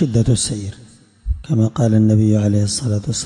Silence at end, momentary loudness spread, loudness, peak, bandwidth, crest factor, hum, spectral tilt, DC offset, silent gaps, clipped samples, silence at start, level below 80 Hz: 0 s; 14 LU; -17 LUFS; -6 dBFS; 11.5 kHz; 12 dB; none; -6 dB/octave; under 0.1%; none; under 0.1%; 0 s; -34 dBFS